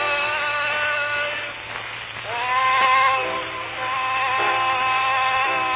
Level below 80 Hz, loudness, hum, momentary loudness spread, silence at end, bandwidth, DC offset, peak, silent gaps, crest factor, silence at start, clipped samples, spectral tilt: -56 dBFS; -21 LUFS; none; 12 LU; 0 s; 4 kHz; under 0.1%; -6 dBFS; none; 16 dB; 0 s; under 0.1%; -6 dB/octave